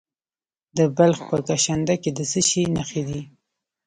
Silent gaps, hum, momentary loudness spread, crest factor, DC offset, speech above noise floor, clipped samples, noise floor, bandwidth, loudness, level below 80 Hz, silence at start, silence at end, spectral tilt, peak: none; none; 11 LU; 20 dB; under 0.1%; over 69 dB; under 0.1%; under -90 dBFS; 11 kHz; -21 LUFS; -52 dBFS; 0.75 s; 0.6 s; -4.5 dB/octave; -4 dBFS